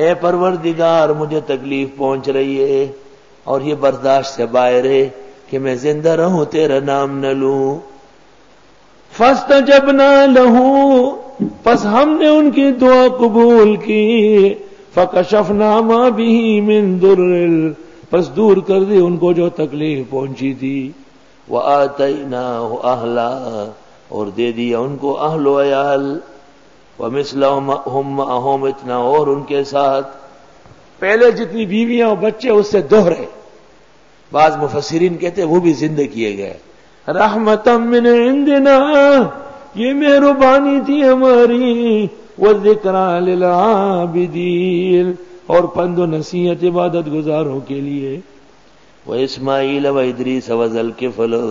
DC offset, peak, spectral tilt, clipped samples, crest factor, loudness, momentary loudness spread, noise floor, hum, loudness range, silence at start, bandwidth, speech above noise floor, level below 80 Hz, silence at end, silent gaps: 0.4%; 0 dBFS; -6.5 dB/octave; under 0.1%; 14 dB; -13 LUFS; 12 LU; -48 dBFS; none; 8 LU; 0 s; 7.6 kHz; 35 dB; -52 dBFS; 0 s; none